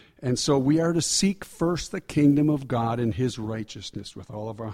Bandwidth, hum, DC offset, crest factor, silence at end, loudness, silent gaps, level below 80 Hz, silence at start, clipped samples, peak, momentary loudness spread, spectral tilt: 15.5 kHz; none; under 0.1%; 16 dB; 0 s; -24 LUFS; none; -50 dBFS; 0.2 s; under 0.1%; -10 dBFS; 15 LU; -5 dB/octave